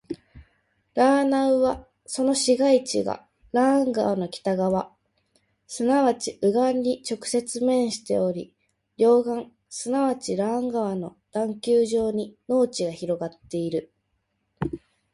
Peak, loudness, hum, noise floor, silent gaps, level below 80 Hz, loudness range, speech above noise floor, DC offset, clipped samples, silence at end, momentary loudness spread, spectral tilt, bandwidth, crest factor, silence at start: -8 dBFS; -24 LUFS; none; -74 dBFS; none; -58 dBFS; 3 LU; 51 dB; under 0.1%; under 0.1%; 0.35 s; 13 LU; -5 dB/octave; 11.5 kHz; 16 dB; 0.1 s